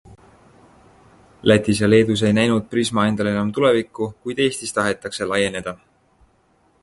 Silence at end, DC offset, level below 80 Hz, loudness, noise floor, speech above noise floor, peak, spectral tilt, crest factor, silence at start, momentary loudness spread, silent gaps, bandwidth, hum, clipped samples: 1.1 s; under 0.1%; -50 dBFS; -19 LUFS; -60 dBFS; 41 dB; 0 dBFS; -5 dB/octave; 20 dB; 0.1 s; 11 LU; none; 11.5 kHz; none; under 0.1%